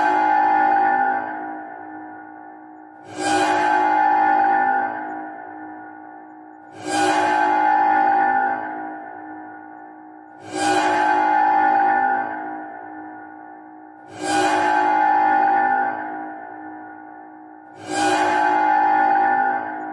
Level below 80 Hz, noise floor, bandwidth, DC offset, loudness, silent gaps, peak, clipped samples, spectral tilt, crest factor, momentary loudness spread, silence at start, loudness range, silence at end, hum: -68 dBFS; -41 dBFS; 11.5 kHz; under 0.1%; -19 LUFS; none; -6 dBFS; under 0.1%; -3 dB/octave; 14 dB; 22 LU; 0 s; 3 LU; 0 s; none